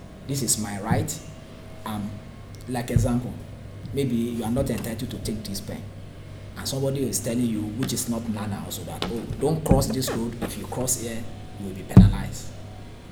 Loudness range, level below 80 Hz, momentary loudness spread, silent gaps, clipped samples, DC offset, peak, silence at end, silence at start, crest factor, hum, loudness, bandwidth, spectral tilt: 6 LU; -36 dBFS; 19 LU; none; under 0.1%; under 0.1%; 0 dBFS; 0 s; 0 s; 26 dB; none; -25 LUFS; 19.5 kHz; -5.5 dB/octave